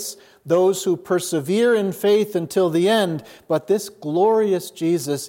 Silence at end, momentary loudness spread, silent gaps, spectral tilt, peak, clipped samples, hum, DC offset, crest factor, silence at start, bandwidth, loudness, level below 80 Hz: 0 s; 7 LU; none; -5 dB/octave; -6 dBFS; under 0.1%; none; under 0.1%; 14 dB; 0 s; 17 kHz; -20 LUFS; -72 dBFS